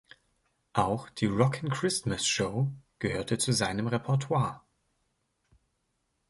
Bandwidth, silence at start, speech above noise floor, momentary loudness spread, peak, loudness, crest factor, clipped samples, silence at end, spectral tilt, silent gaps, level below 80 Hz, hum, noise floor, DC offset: 12 kHz; 0.75 s; 49 dB; 7 LU; -10 dBFS; -29 LUFS; 22 dB; under 0.1%; 1.7 s; -4.5 dB/octave; none; -58 dBFS; none; -77 dBFS; under 0.1%